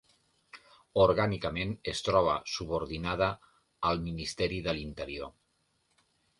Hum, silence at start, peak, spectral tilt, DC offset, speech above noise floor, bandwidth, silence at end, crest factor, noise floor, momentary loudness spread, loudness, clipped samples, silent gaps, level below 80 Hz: none; 0.55 s; -12 dBFS; -5 dB/octave; under 0.1%; 44 dB; 11.5 kHz; 1.1 s; 22 dB; -75 dBFS; 13 LU; -31 LUFS; under 0.1%; none; -50 dBFS